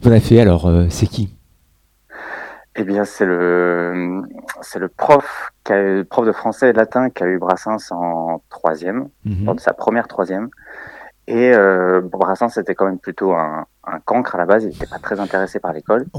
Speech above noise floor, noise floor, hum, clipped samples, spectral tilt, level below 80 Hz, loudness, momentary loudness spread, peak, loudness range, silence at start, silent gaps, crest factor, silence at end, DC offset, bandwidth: 42 dB; -58 dBFS; none; under 0.1%; -7.5 dB/octave; -38 dBFS; -17 LUFS; 16 LU; 0 dBFS; 4 LU; 0 s; none; 16 dB; 0 s; under 0.1%; 15.5 kHz